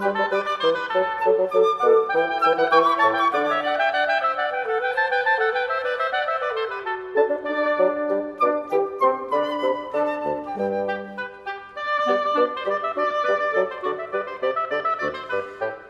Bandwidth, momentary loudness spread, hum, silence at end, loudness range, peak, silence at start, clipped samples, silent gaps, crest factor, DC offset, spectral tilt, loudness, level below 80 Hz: 12 kHz; 9 LU; none; 0 s; 5 LU; -4 dBFS; 0 s; under 0.1%; none; 18 dB; under 0.1%; -4.5 dB/octave; -22 LUFS; -66 dBFS